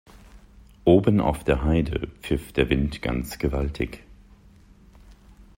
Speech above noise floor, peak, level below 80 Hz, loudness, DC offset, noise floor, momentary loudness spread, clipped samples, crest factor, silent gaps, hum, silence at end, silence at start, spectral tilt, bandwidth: 29 dB; -4 dBFS; -36 dBFS; -24 LUFS; under 0.1%; -52 dBFS; 12 LU; under 0.1%; 22 dB; none; none; 0.15 s; 0.35 s; -7.5 dB/octave; 16 kHz